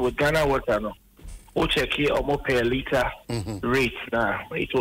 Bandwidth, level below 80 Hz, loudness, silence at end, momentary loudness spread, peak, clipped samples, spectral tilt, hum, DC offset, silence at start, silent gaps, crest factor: 16 kHz; -40 dBFS; -24 LUFS; 0 s; 7 LU; -12 dBFS; under 0.1%; -5 dB/octave; none; under 0.1%; 0 s; none; 12 dB